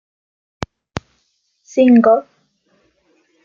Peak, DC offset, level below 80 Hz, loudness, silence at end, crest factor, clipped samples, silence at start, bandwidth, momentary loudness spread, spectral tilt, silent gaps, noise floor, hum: -2 dBFS; under 0.1%; -50 dBFS; -13 LUFS; 1.25 s; 16 dB; under 0.1%; 1.75 s; 7.2 kHz; 21 LU; -7 dB/octave; none; -65 dBFS; none